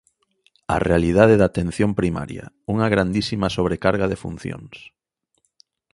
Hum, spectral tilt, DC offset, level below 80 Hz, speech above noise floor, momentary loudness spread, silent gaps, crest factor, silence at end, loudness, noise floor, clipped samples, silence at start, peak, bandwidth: none; -7 dB/octave; under 0.1%; -40 dBFS; 51 dB; 18 LU; none; 20 dB; 1.05 s; -20 LUFS; -71 dBFS; under 0.1%; 0.7 s; 0 dBFS; 11.5 kHz